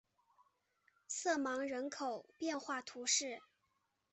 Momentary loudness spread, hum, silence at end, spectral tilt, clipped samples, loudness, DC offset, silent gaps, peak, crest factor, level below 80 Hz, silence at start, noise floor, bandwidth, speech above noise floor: 10 LU; none; 0.7 s; 0 dB/octave; under 0.1%; -39 LUFS; under 0.1%; none; -22 dBFS; 20 dB; -88 dBFS; 1.1 s; -83 dBFS; 8.4 kHz; 43 dB